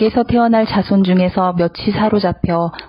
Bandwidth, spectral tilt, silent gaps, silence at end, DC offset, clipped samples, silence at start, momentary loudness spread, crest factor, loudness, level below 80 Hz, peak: 5.4 kHz; -10.5 dB/octave; none; 0.05 s; under 0.1%; under 0.1%; 0 s; 5 LU; 12 dB; -15 LUFS; -40 dBFS; -2 dBFS